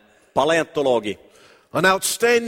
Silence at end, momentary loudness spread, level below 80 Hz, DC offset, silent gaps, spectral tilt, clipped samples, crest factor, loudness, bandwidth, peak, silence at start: 0 s; 11 LU; -58 dBFS; under 0.1%; none; -3 dB/octave; under 0.1%; 18 dB; -20 LUFS; 16.5 kHz; -4 dBFS; 0.35 s